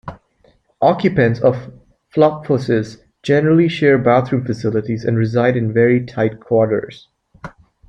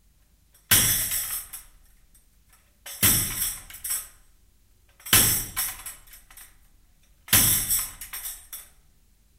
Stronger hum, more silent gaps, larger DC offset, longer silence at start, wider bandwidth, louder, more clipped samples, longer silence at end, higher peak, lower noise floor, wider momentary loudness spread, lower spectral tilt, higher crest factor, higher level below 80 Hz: neither; neither; neither; second, 0.05 s vs 0.7 s; second, 8.6 kHz vs 16.5 kHz; first, -16 LUFS vs -22 LUFS; neither; second, 0.4 s vs 0.75 s; about the same, -2 dBFS vs -4 dBFS; second, -56 dBFS vs -61 dBFS; second, 16 LU vs 23 LU; first, -8 dB/octave vs -1 dB/octave; second, 16 dB vs 24 dB; about the same, -50 dBFS vs -46 dBFS